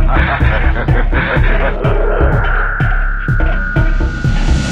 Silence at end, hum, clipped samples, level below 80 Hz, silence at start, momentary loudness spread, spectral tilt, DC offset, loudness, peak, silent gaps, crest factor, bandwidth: 0 s; none; under 0.1%; -14 dBFS; 0 s; 3 LU; -7 dB/octave; under 0.1%; -15 LUFS; 0 dBFS; none; 12 dB; 7.6 kHz